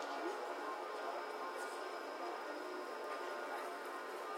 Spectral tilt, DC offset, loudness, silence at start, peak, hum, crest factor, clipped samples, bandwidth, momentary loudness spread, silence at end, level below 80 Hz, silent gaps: -1.5 dB/octave; under 0.1%; -45 LUFS; 0 s; -30 dBFS; none; 14 dB; under 0.1%; 16.5 kHz; 2 LU; 0 s; under -90 dBFS; none